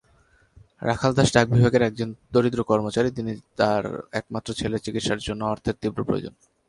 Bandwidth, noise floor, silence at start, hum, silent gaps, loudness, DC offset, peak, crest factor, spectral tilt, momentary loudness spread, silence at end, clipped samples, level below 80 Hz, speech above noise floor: 11.5 kHz; -60 dBFS; 0.8 s; none; none; -24 LUFS; under 0.1%; -2 dBFS; 22 dB; -6 dB/octave; 12 LU; 0.4 s; under 0.1%; -48 dBFS; 37 dB